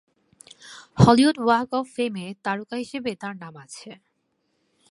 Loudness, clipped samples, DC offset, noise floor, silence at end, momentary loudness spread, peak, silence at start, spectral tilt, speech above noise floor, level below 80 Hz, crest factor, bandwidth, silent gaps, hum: -22 LUFS; under 0.1%; under 0.1%; -72 dBFS; 1 s; 24 LU; -2 dBFS; 0.65 s; -6.5 dB/octave; 50 dB; -50 dBFS; 24 dB; 11.5 kHz; none; none